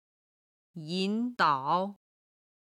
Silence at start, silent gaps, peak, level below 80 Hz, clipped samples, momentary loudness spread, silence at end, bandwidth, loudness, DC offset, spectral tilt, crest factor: 0.75 s; none; -12 dBFS; -82 dBFS; under 0.1%; 16 LU; 0.75 s; 12 kHz; -30 LUFS; under 0.1%; -5.5 dB/octave; 20 dB